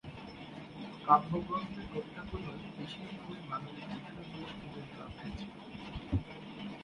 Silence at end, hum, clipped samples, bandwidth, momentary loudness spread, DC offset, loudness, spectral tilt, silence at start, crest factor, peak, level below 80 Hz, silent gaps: 0 s; none; under 0.1%; 11 kHz; 17 LU; under 0.1%; -39 LUFS; -7 dB/octave; 0.05 s; 28 dB; -10 dBFS; -54 dBFS; none